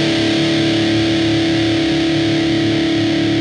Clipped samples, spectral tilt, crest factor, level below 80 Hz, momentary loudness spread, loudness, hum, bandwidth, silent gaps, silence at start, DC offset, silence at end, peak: under 0.1%; -5.5 dB/octave; 10 dB; -40 dBFS; 1 LU; -15 LUFS; none; 10.5 kHz; none; 0 s; under 0.1%; 0 s; -6 dBFS